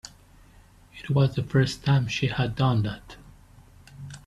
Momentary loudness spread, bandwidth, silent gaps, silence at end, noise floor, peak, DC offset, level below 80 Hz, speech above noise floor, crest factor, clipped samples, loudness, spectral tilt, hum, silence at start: 19 LU; 11 kHz; none; 0.1 s; -53 dBFS; -8 dBFS; under 0.1%; -50 dBFS; 30 dB; 18 dB; under 0.1%; -25 LUFS; -6.5 dB/octave; none; 0.05 s